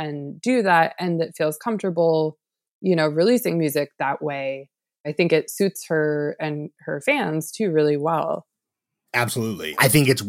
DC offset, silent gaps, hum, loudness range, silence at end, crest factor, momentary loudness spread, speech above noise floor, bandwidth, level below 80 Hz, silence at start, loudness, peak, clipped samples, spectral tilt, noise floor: under 0.1%; 2.71-2.81 s, 5.00-5.04 s; none; 3 LU; 0 s; 20 dB; 10 LU; 62 dB; 17 kHz; -64 dBFS; 0 s; -22 LUFS; -4 dBFS; under 0.1%; -5 dB/octave; -84 dBFS